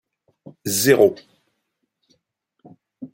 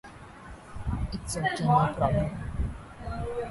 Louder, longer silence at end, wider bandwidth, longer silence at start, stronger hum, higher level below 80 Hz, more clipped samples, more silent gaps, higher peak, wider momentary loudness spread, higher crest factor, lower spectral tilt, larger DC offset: first, -17 LUFS vs -29 LUFS; about the same, 0.05 s vs 0 s; first, 16.5 kHz vs 11.5 kHz; first, 0.65 s vs 0.05 s; neither; second, -64 dBFS vs -40 dBFS; neither; neither; first, -2 dBFS vs -10 dBFS; first, 25 LU vs 22 LU; about the same, 22 dB vs 18 dB; second, -3.5 dB/octave vs -6 dB/octave; neither